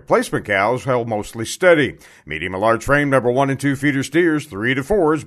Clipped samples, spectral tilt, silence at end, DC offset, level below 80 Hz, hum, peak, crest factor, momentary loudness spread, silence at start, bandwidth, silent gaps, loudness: under 0.1%; -5.5 dB/octave; 0 s; under 0.1%; -42 dBFS; none; 0 dBFS; 18 dB; 10 LU; 0.1 s; 13.5 kHz; none; -18 LUFS